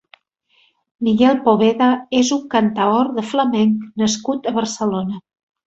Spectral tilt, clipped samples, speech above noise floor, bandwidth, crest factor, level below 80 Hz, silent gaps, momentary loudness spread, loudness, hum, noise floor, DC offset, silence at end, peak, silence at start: -5 dB/octave; under 0.1%; 44 dB; 8 kHz; 16 dB; -58 dBFS; none; 7 LU; -17 LUFS; none; -60 dBFS; under 0.1%; 0.45 s; -2 dBFS; 1 s